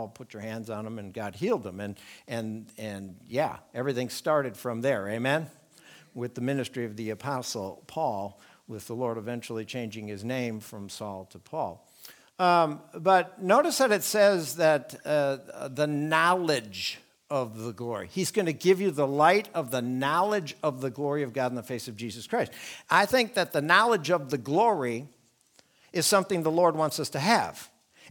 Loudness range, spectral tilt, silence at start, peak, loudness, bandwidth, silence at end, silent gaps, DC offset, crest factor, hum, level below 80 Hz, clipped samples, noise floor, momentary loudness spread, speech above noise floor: 9 LU; -4.5 dB/octave; 0 s; -4 dBFS; -28 LUFS; 19.5 kHz; 0 s; none; under 0.1%; 24 dB; none; -72 dBFS; under 0.1%; -63 dBFS; 15 LU; 36 dB